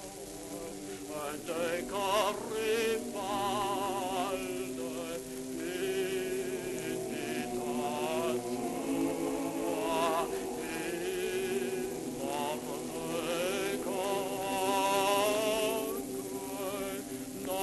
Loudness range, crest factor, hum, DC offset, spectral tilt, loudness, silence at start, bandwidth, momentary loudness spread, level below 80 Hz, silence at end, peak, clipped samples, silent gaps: 4 LU; 18 dB; none; under 0.1%; -3.5 dB/octave; -34 LUFS; 0 s; 12.5 kHz; 9 LU; -62 dBFS; 0 s; -16 dBFS; under 0.1%; none